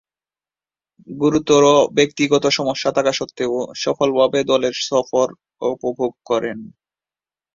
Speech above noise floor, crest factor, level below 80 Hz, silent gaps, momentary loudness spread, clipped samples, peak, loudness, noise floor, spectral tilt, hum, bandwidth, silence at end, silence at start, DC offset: over 72 dB; 18 dB; -58 dBFS; none; 10 LU; under 0.1%; -2 dBFS; -18 LUFS; under -90 dBFS; -4 dB/octave; none; 7.6 kHz; 0.85 s; 1.1 s; under 0.1%